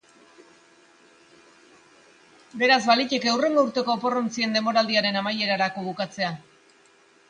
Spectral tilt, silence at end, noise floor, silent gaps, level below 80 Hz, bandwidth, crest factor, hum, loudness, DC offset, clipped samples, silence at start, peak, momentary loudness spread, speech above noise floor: -3.5 dB/octave; 0.9 s; -57 dBFS; none; -74 dBFS; 10 kHz; 22 dB; none; -23 LUFS; under 0.1%; under 0.1%; 2.55 s; -4 dBFS; 10 LU; 34 dB